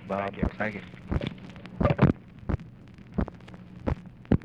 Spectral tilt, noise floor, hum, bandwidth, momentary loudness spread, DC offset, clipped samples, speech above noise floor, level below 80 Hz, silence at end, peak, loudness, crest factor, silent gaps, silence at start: -9 dB/octave; -47 dBFS; none; 7.2 kHz; 19 LU; under 0.1%; under 0.1%; 17 dB; -40 dBFS; 0 s; -10 dBFS; -30 LUFS; 20 dB; none; 0 s